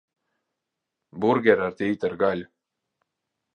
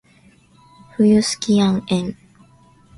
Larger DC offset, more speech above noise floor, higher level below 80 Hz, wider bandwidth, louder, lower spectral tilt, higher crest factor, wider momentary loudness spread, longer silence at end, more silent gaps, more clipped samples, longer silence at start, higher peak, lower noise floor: neither; first, 61 dB vs 36 dB; second, -64 dBFS vs -52 dBFS; second, 8.8 kHz vs 11.5 kHz; second, -23 LUFS vs -17 LUFS; first, -7.5 dB/octave vs -5.5 dB/octave; first, 24 dB vs 16 dB; second, 7 LU vs 12 LU; first, 1.1 s vs 0.85 s; neither; neither; first, 1.15 s vs 1 s; about the same, -4 dBFS vs -6 dBFS; first, -84 dBFS vs -52 dBFS